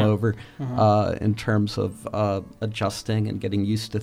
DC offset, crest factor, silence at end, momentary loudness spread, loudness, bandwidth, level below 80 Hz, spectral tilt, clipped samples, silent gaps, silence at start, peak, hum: under 0.1%; 16 dB; 0 s; 9 LU; -24 LUFS; 14.5 kHz; -50 dBFS; -7 dB/octave; under 0.1%; none; 0 s; -8 dBFS; none